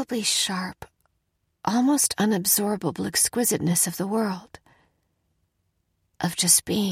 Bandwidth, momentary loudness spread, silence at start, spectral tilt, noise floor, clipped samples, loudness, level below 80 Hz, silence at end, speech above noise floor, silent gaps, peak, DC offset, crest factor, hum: 16.5 kHz; 12 LU; 0 s; -3 dB/octave; -74 dBFS; under 0.1%; -22 LUFS; -60 dBFS; 0 s; 50 dB; none; -4 dBFS; under 0.1%; 22 dB; none